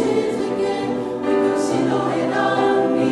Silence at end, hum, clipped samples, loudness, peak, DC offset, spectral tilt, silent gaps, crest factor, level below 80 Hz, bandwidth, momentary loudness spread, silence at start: 0 s; none; under 0.1%; -20 LUFS; -6 dBFS; under 0.1%; -5.5 dB/octave; none; 12 dB; -56 dBFS; 12 kHz; 5 LU; 0 s